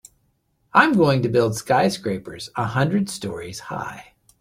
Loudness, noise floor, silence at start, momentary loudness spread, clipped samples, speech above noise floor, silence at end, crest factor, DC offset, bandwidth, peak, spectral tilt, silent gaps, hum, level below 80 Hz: -21 LUFS; -67 dBFS; 0.75 s; 15 LU; under 0.1%; 46 dB; 0.4 s; 20 dB; under 0.1%; 16 kHz; -2 dBFS; -5.5 dB/octave; none; none; -56 dBFS